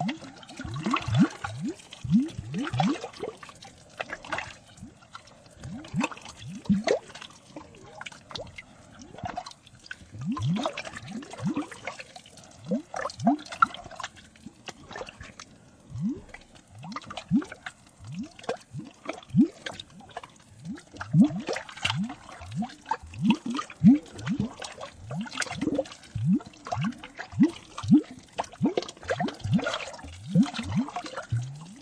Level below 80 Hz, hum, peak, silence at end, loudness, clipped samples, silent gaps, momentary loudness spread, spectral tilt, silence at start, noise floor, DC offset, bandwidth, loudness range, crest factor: -56 dBFS; none; -6 dBFS; 0 s; -29 LUFS; under 0.1%; none; 21 LU; -6 dB/octave; 0 s; -52 dBFS; under 0.1%; 10.5 kHz; 8 LU; 24 dB